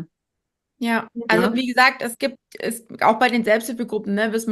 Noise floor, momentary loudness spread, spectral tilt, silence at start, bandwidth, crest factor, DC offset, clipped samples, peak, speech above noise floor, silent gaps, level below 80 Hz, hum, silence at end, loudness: -81 dBFS; 12 LU; -4 dB/octave; 0 s; 13 kHz; 20 dB; under 0.1%; under 0.1%; -2 dBFS; 60 dB; none; -66 dBFS; none; 0 s; -20 LUFS